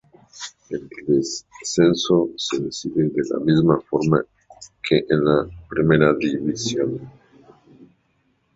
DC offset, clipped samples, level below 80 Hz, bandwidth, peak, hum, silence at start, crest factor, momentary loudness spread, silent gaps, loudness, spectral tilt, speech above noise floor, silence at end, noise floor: under 0.1%; under 0.1%; -52 dBFS; 8 kHz; -2 dBFS; none; 0.35 s; 20 dB; 15 LU; none; -20 LUFS; -5.5 dB/octave; 46 dB; 0.7 s; -66 dBFS